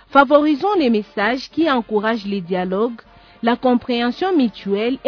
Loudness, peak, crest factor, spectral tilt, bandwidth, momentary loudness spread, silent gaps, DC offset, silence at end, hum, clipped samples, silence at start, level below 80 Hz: -18 LUFS; 0 dBFS; 18 dB; -7 dB/octave; 5.4 kHz; 8 LU; none; under 0.1%; 0.1 s; none; under 0.1%; 0.1 s; -54 dBFS